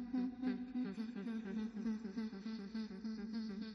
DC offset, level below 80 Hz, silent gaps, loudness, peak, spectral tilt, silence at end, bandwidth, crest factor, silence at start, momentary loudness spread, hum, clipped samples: under 0.1%; -72 dBFS; none; -44 LUFS; -30 dBFS; -7 dB/octave; 0 s; 6.6 kHz; 14 dB; 0 s; 5 LU; none; under 0.1%